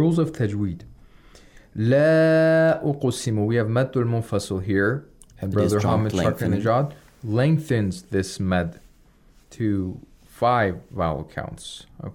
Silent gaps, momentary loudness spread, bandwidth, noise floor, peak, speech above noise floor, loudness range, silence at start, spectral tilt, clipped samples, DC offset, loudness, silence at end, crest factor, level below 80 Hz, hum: none; 16 LU; 16.5 kHz; -54 dBFS; -8 dBFS; 32 dB; 5 LU; 0 s; -7 dB/octave; under 0.1%; under 0.1%; -22 LUFS; 0.05 s; 14 dB; -52 dBFS; none